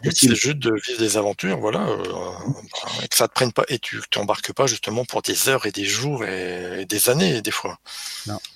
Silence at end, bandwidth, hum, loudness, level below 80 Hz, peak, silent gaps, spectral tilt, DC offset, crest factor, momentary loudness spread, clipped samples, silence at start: 0.05 s; 16.5 kHz; none; -21 LUFS; -58 dBFS; -2 dBFS; none; -3 dB/octave; under 0.1%; 20 dB; 12 LU; under 0.1%; 0 s